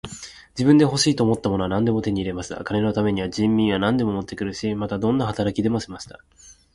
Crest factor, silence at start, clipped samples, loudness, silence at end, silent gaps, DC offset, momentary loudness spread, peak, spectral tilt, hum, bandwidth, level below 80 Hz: 18 dB; 0.05 s; under 0.1%; -22 LUFS; 0.25 s; none; under 0.1%; 13 LU; -4 dBFS; -5.5 dB/octave; none; 11.5 kHz; -46 dBFS